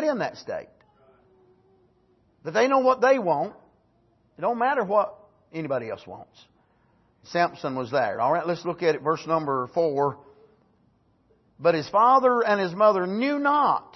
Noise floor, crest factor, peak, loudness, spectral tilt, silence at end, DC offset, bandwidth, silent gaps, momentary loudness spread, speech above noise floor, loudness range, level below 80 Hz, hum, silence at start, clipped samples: -64 dBFS; 18 dB; -6 dBFS; -24 LUFS; -6 dB/octave; 0.15 s; under 0.1%; 6.2 kHz; none; 16 LU; 41 dB; 6 LU; -70 dBFS; none; 0 s; under 0.1%